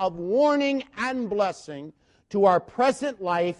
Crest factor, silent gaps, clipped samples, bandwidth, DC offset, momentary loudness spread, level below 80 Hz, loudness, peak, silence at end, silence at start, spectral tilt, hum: 18 dB; none; under 0.1%; 11.5 kHz; under 0.1%; 11 LU; -64 dBFS; -24 LUFS; -6 dBFS; 0.05 s; 0 s; -5.5 dB/octave; none